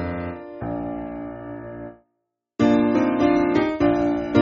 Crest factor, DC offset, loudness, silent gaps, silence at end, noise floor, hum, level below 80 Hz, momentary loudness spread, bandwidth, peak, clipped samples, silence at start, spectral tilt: 18 dB; under 0.1%; -22 LUFS; none; 0 s; -77 dBFS; none; -46 dBFS; 17 LU; 7.2 kHz; -4 dBFS; under 0.1%; 0 s; -6 dB/octave